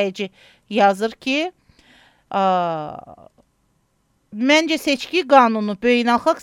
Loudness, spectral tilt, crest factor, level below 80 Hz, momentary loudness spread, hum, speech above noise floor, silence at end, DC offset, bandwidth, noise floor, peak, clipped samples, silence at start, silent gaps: -18 LUFS; -4 dB/octave; 20 dB; -62 dBFS; 15 LU; none; 47 dB; 0 s; under 0.1%; 15.5 kHz; -65 dBFS; 0 dBFS; under 0.1%; 0 s; none